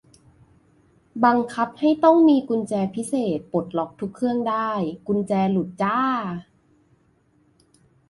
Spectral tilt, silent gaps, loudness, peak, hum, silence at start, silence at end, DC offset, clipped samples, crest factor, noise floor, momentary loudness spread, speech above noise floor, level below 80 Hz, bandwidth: -7 dB/octave; none; -22 LUFS; -4 dBFS; none; 1.15 s; 1.7 s; under 0.1%; under 0.1%; 18 dB; -62 dBFS; 11 LU; 41 dB; -62 dBFS; 11.5 kHz